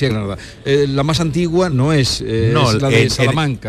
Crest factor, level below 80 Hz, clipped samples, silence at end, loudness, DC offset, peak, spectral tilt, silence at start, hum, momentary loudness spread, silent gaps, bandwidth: 12 dB; -36 dBFS; under 0.1%; 0 s; -15 LUFS; under 0.1%; -4 dBFS; -5.5 dB/octave; 0 s; none; 5 LU; none; 14 kHz